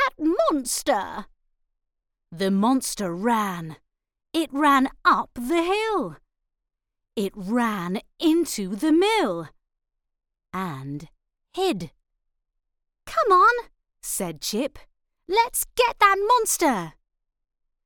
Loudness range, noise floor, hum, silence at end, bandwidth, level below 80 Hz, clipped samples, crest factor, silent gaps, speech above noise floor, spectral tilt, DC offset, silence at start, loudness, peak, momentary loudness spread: 5 LU; -83 dBFS; none; 0.95 s; 18 kHz; -54 dBFS; under 0.1%; 20 dB; none; 60 dB; -3.5 dB/octave; under 0.1%; 0 s; -23 LUFS; -4 dBFS; 16 LU